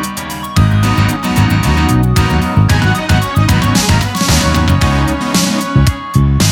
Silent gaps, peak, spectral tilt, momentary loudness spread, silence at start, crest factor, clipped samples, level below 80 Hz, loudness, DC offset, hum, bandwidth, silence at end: none; 0 dBFS; -5 dB/octave; 2 LU; 0 s; 10 dB; under 0.1%; -20 dBFS; -12 LUFS; under 0.1%; none; 18.5 kHz; 0 s